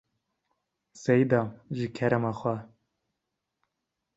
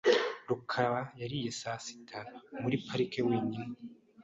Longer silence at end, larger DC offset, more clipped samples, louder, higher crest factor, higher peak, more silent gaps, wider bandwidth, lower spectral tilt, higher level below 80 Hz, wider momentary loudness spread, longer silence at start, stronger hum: first, 1.5 s vs 0 s; neither; neither; first, -28 LUFS vs -34 LUFS; about the same, 22 dB vs 20 dB; first, -10 dBFS vs -14 dBFS; neither; about the same, 8 kHz vs 8.2 kHz; first, -7.5 dB/octave vs -5 dB/octave; about the same, -66 dBFS vs -70 dBFS; about the same, 12 LU vs 14 LU; first, 0.95 s vs 0.05 s; neither